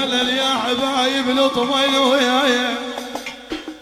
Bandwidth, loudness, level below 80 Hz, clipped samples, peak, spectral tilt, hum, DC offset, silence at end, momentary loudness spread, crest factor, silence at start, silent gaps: 15.5 kHz; -17 LUFS; -54 dBFS; under 0.1%; -4 dBFS; -2 dB/octave; none; under 0.1%; 0 s; 14 LU; 14 dB; 0 s; none